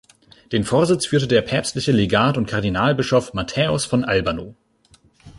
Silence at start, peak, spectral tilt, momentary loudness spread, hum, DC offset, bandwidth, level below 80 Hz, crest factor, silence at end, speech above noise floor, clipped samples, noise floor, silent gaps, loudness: 0.5 s; -4 dBFS; -5 dB/octave; 8 LU; none; under 0.1%; 11.5 kHz; -44 dBFS; 16 dB; 0.1 s; 37 dB; under 0.1%; -56 dBFS; none; -19 LUFS